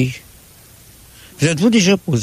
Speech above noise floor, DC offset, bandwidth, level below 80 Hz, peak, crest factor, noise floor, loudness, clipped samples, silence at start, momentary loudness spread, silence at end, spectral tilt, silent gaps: 29 dB; under 0.1%; 15.5 kHz; -50 dBFS; -4 dBFS; 14 dB; -44 dBFS; -15 LUFS; under 0.1%; 0 s; 10 LU; 0 s; -5 dB/octave; none